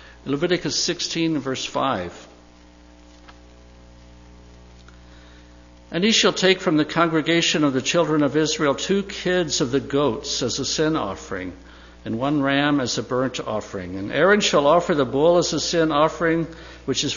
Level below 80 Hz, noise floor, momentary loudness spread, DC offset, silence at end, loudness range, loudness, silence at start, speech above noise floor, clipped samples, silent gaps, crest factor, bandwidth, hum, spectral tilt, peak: -48 dBFS; -48 dBFS; 12 LU; under 0.1%; 0 s; 8 LU; -21 LUFS; 0 s; 27 dB; under 0.1%; none; 20 dB; 7.4 kHz; 60 Hz at -50 dBFS; -4 dB/octave; -4 dBFS